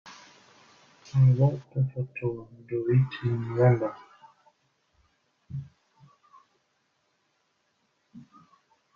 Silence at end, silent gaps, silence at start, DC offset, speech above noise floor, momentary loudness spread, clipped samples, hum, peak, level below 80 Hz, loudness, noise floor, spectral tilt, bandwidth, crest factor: 0.75 s; none; 0.05 s; under 0.1%; 48 dB; 19 LU; under 0.1%; none; -8 dBFS; -62 dBFS; -26 LUFS; -73 dBFS; -9.5 dB/octave; 6.6 kHz; 22 dB